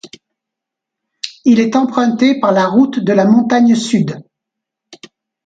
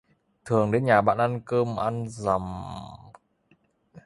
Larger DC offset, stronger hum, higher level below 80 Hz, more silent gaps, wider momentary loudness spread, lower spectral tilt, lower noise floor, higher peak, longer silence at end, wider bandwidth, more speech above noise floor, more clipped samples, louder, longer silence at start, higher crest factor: neither; neither; second, -60 dBFS vs -54 dBFS; neither; second, 10 LU vs 17 LU; about the same, -6 dB/octave vs -7 dB/octave; first, -81 dBFS vs -65 dBFS; first, 0 dBFS vs -4 dBFS; first, 0.5 s vs 0.05 s; second, 9.2 kHz vs 11.5 kHz; first, 70 dB vs 41 dB; neither; first, -12 LUFS vs -25 LUFS; second, 0.05 s vs 0.45 s; second, 14 dB vs 22 dB